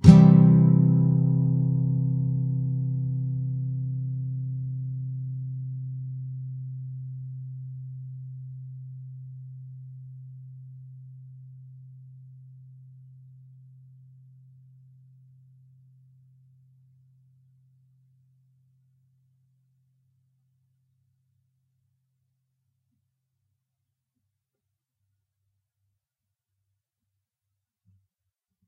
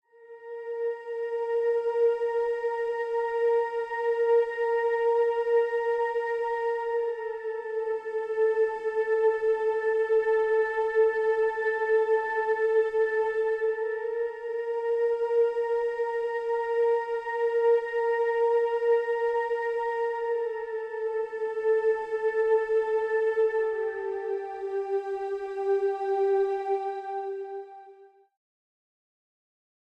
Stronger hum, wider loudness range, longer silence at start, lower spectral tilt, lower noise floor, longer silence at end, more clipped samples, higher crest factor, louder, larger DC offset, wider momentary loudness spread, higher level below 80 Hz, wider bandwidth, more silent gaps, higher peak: neither; first, 26 LU vs 4 LU; second, 0.05 s vs 0.2 s; first, -12 dB/octave vs -4 dB/octave; first, -86 dBFS vs -54 dBFS; first, 16.7 s vs 1.95 s; neither; first, 26 dB vs 12 dB; first, -24 LUFS vs -27 LUFS; neither; first, 26 LU vs 8 LU; first, -52 dBFS vs -70 dBFS; second, 3.7 kHz vs 5.4 kHz; neither; first, 0 dBFS vs -14 dBFS